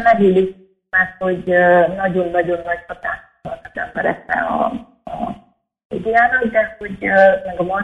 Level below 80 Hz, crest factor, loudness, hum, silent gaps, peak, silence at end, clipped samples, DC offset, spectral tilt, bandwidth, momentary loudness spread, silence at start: -48 dBFS; 16 dB; -17 LUFS; none; 5.85-5.90 s; 0 dBFS; 0 s; under 0.1%; under 0.1%; -8 dB/octave; 8.6 kHz; 16 LU; 0 s